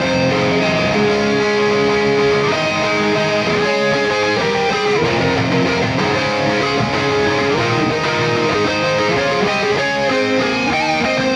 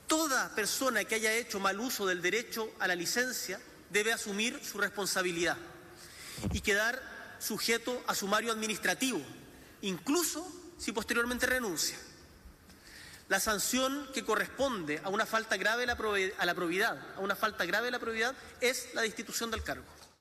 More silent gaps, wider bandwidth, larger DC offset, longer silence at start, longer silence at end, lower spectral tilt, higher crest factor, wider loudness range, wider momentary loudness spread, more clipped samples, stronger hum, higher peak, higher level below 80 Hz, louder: neither; second, 11 kHz vs 15.5 kHz; neither; about the same, 0 s vs 0 s; second, 0 s vs 0.15 s; first, -5 dB/octave vs -2 dB/octave; about the same, 12 dB vs 16 dB; about the same, 1 LU vs 2 LU; second, 2 LU vs 11 LU; neither; neither; first, -4 dBFS vs -18 dBFS; first, -46 dBFS vs -58 dBFS; first, -15 LUFS vs -32 LUFS